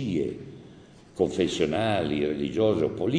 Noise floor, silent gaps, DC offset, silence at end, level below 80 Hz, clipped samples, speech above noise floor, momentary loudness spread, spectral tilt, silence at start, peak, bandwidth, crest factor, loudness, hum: -50 dBFS; none; under 0.1%; 0 s; -54 dBFS; under 0.1%; 25 dB; 14 LU; -6 dB/octave; 0 s; -8 dBFS; 10 kHz; 18 dB; -26 LUFS; none